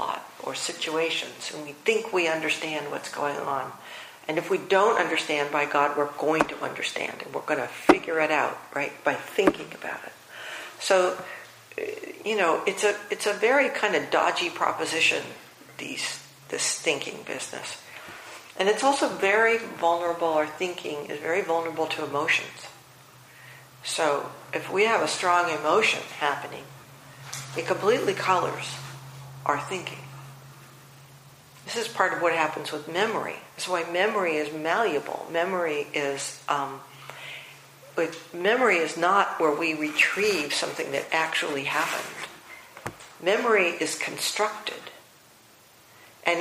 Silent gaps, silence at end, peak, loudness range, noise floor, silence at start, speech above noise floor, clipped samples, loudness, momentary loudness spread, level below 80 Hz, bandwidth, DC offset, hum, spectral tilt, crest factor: none; 0 s; 0 dBFS; 5 LU; -55 dBFS; 0 s; 29 dB; under 0.1%; -26 LUFS; 17 LU; -70 dBFS; 15.5 kHz; under 0.1%; none; -2.5 dB/octave; 26 dB